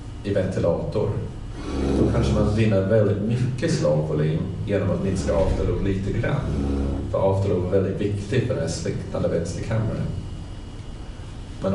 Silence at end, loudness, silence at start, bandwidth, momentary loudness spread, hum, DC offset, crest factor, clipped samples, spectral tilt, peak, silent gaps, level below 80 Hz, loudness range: 0 s; -23 LUFS; 0 s; 11.5 kHz; 14 LU; none; under 0.1%; 16 dB; under 0.1%; -7.5 dB/octave; -8 dBFS; none; -34 dBFS; 5 LU